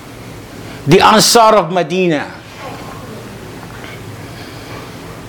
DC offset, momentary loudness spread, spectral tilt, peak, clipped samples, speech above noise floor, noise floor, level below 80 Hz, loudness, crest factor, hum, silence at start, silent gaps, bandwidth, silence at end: under 0.1%; 23 LU; -4 dB/octave; 0 dBFS; under 0.1%; 22 dB; -31 dBFS; -42 dBFS; -10 LUFS; 16 dB; none; 0 s; none; 19.5 kHz; 0 s